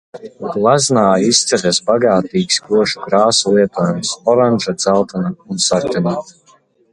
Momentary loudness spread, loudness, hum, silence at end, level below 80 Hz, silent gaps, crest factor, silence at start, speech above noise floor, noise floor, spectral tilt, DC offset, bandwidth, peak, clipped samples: 8 LU; -14 LUFS; none; 0.6 s; -52 dBFS; none; 14 dB; 0.15 s; 37 dB; -52 dBFS; -4 dB/octave; under 0.1%; 11 kHz; 0 dBFS; under 0.1%